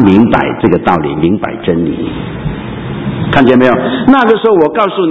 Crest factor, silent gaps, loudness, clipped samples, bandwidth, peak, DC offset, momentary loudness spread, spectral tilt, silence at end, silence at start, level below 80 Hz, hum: 10 dB; none; -10 LUFS; 0.9%; 6.4 kHz; 0 dBFS; under 0.1%; 12 LU; -8.5 dB/octave; 0 s; 0 s; -34 dBFS; none